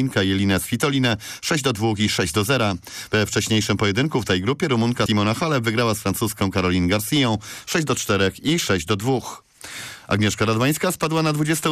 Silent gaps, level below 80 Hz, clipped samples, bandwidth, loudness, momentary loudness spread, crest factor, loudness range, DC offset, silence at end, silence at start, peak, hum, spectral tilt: none; -48 dBFS; under 0.1%; 15.5 kHz; -21 LUFS; 5 LU; 12 dB; 1 LU; under 0.1%; 0 s; 0 s; -10 dBFS; none; -4.5 dB/octave